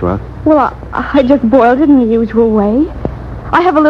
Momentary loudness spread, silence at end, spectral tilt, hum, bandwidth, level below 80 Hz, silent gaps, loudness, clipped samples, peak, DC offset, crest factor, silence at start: 11 LU; 0 s; -8.5 dB/octave; none; 6.4 kHz; -30 dBFS; none; -11 LUFS; 0.3%; 0 dBFS; under 0.1%; 10 dB; 0 s